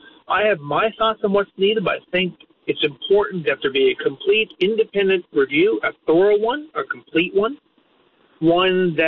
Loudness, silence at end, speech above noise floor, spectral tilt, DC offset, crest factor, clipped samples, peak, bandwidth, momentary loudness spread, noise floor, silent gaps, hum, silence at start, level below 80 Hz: -19 LUFS; 0 s; 40 dB; -3 dB/octave; under 0.1%; 12 dB; under 0.1%; -8 dBFS; 4.5 kHz; 6 LU; -59 dBFS; none; none; 0.3 s; -56 dBFS